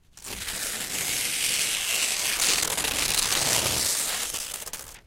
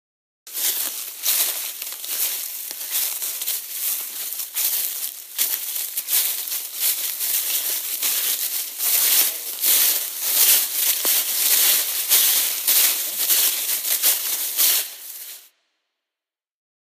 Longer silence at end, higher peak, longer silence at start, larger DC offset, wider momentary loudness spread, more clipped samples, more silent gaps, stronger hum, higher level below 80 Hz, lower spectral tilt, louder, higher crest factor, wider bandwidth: second, 0.05 s vs 1.45 s; second, -8 dBFS vs 0 dBFS; second, 0.15 s vs 0.45 s; neither; about the same, 10 LU vs 11 LU; neither; neither; neither; first, -50 dBFS vs under -90 dBFS; first, 0.5 dB/octave vs 4.5 dB/octave; second, -24 LUFS vs -19 LUFS; about the same, 20 dB vs 22 dB; about the same, 17 kHz vs 15.5 kHz